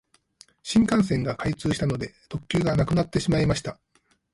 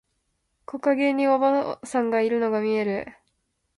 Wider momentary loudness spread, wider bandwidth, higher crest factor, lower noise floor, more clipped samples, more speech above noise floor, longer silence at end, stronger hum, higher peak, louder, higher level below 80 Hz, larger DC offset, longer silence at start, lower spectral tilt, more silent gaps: first, 12 LU vs 9 LU; about the same, 11.5 kHz vs 11.5 kHz; about the same, 16 dB vs 16 dB; second, -57 dBFS vs -74 dBFS; neither; second, 33 dB vs 51 dB; about the same, 0.6 s vs 0.65 s; neither; about the same, -8 dBFS vs -10 dBFS; about the same, -24 LUFS vs -23 LUFS; first, -44 dBFS vs -66 dBFS; neither; about the same, 0.65 s vs 0.7 s; about the same, -6 dB/octave vs -6 dB/octave; neither